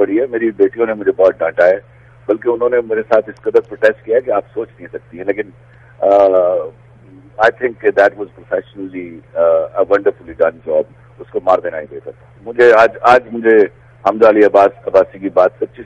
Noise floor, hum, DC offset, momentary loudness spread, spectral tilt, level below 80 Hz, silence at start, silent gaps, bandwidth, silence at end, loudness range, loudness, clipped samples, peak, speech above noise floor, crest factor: -41 dBFS; none; under 0.1%; 17 LU; -6.5 dB/octave; -52 dBFS; 0 s; none; 8.2 kHz; 0 s; 6 LU; -13 LUFS; under 0.1%; 0 dBFS; 28 dB; 14 dB